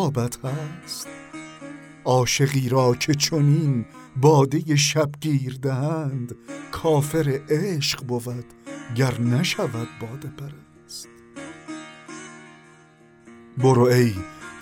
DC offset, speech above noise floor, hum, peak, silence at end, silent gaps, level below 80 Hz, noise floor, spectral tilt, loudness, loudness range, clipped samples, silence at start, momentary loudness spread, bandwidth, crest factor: under 0.1%; 30 dB; none; -4 dBFS; 0 s; none; -54 dBFS; -52 dBFS; -5.5 dB/octave; -22 LUFS; 12 LU; under 0.1%; 0 s; 20 LU; 17.5 kHz; 20 dB